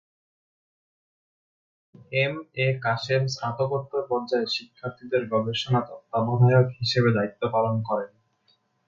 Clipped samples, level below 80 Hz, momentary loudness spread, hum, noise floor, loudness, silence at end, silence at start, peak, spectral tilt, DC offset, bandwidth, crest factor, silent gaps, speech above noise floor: under 0.1%; -62 dBFS; 8 LU; none; -67 dBFS; -25 LUFS; 0.8 s; 2.1 s; -8 dBFS; -6.5 dB/octave; under 0.1%; 7.4 kHz; 18 dB; none; 43 dB